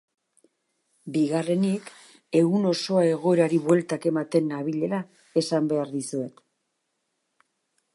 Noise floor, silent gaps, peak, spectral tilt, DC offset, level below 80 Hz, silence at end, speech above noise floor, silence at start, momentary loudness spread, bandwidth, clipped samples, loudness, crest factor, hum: -77 dBFS; none; -8 dBFS; -6.5 dB/octave; under 0.1%; -78 dBFS; 1.65 s; 54 dB; 1.05 s; 10 LU; 11.5 kHz; under 0.1%; -25 LUFS; 18 dB; none